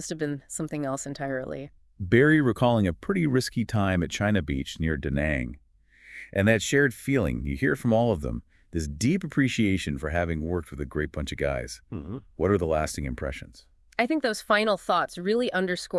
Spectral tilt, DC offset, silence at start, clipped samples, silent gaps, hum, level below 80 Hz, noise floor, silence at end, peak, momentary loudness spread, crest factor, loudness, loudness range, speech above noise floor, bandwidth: -5.5 dB/octave; under 0.1%; 0 s; under 0.1%; none; none; -44 dBFS; -54 dBFS; 0 s; -6 dBFS; 12 LU; 20 dB; -26 LUFS; 5 LU; 28 dB; 12 kHz